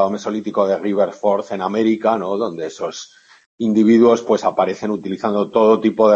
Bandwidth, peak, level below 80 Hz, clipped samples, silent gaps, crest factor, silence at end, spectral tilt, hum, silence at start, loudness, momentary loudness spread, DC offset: 7.6 kHz; -2 dBFS; -64 dBFS; under 0.1%; 3.46-3.58 s; 16 dB; 0 s; -6.5 dB/octave; none; 0 s; -17 LUFS; 11 LU; under 0.1%